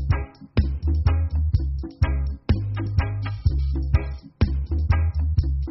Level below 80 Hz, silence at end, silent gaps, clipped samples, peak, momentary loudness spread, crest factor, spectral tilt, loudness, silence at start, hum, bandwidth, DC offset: -24 dBFS; 0 s; none; under 0.1%; -6 dBFS; 4 LU; 16 dB; -7.5 dB/octave; -24 LUFS; 0 s; none; 5.8 kHz; under 0.1%